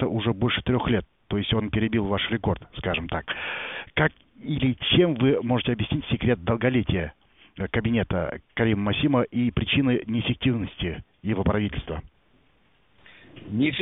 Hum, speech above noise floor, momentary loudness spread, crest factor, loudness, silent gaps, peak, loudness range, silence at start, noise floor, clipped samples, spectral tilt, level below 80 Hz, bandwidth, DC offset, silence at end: none; 39 dB; 10 LU; 20 dB; -25 LUFS; none; -6 dBFS; 3 LU; 0 s; -64 dBFS; under 0.1%; -5 dB/octave; -42 dBFS; 4 kHz; under 0.1%; 0 s